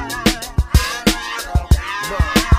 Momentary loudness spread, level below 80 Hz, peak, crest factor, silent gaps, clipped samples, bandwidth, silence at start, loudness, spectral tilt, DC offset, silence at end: 5 LU; -22 dBFS; -2 dBFS; 16 dB; none; under 0.1%; 15.5 kHz; 0 s; -18 LUFS; -4.5 dB/octave; under 0.1%; 0 s